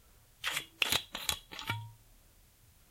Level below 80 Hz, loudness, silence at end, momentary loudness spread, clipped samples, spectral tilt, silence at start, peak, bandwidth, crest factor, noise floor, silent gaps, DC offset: -62 dBFS; -35 LUFS; 0.75 s; 10 LU; under 0.1%; -1 dB/octave; 0.4 s; -8 dBFS; 16.5 kHz; 32 dB; -63 dBFS; none; under 0.1%